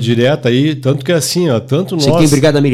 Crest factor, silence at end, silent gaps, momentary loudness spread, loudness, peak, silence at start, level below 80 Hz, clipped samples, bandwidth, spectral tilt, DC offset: 10 dB; 0 s; none; 5 LU; -12 LUFS; -2 dBFS; 0 s; -40 dBFS; under 0.1%; 15.5 kHz; -5.5 dB/octave; under 0.1%